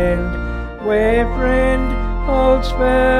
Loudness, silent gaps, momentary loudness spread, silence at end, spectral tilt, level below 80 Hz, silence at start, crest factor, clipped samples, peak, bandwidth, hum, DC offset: -17 LUFS; none; 8 LU; 0 s; -7 dB/octave; -22 dBFS; 0 s; 12 dB; under 0.1%; -2 dBFS; 9.6 kHz; none; under 0.1%